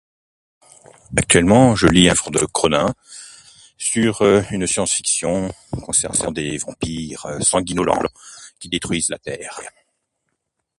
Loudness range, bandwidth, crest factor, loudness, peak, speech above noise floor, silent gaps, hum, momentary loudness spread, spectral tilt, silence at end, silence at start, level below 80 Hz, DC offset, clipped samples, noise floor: 6 LU; 11.5 kHz; 20 dB; -18 LUFS; 0 dBFS; 57 dB; none; none; 19 LU; -3.5 dB/octave; 1.1 s; 1.1 s; -42 dBFS; under 0.1%; under 0.1%; -75 dBFS